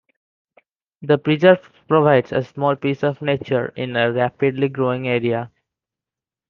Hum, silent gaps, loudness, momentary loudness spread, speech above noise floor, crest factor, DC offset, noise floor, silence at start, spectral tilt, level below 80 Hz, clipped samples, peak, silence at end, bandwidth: none; none; -19 LUFS; 9 LU; 70 dB; 18 dB; under 0.1%; -89 dBFS; 1 s; -8.5 dB/octave; -62 dBFS; under 0.1%; -2 dBFS; 1 s; 6.6 kHz